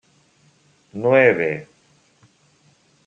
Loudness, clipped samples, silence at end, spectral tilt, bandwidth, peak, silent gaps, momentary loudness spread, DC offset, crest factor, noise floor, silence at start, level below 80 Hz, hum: -18 LUFS; under 0.1%; 1.45 s; -7.5 dB/octave; 7.8 kHz; -2 dBFS; none; 17 LU; under 0.1%; 22 dB; -58 dBFS; 0.95 s; -70 dBFS; none